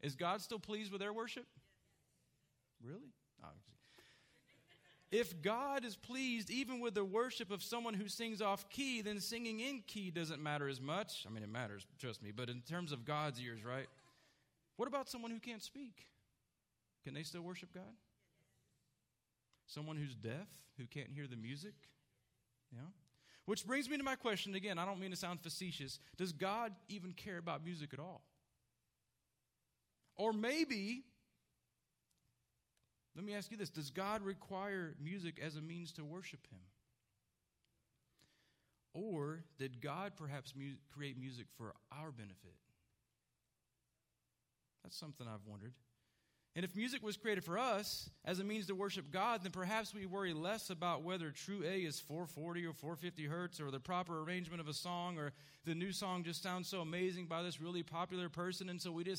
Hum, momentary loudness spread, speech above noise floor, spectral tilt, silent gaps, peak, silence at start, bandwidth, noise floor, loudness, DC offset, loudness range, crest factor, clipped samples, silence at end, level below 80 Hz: none; 13 LU; 43 dB; -4.5 dB/octave; none; -24 dBFS; 0.05 s; 16 kHz; -88 dBFS; -44 LUFS; under 0.1%; 13 LU; 22 dB; under 0.1%; 0 s; -82 dBFS